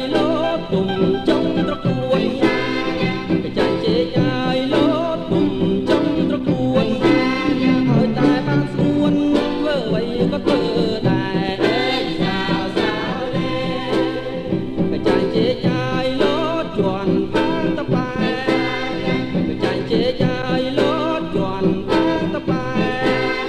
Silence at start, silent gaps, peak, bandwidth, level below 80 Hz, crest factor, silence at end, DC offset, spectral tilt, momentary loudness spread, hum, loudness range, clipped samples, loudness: 0 s; none; -4 dBFS; 10.5 kHz; -42 dBFS; 14 dB; 0 s; under 0.1%; -7 dB/octave; 4 LU; none; 3 LU; under 0.1%; -19 LUFS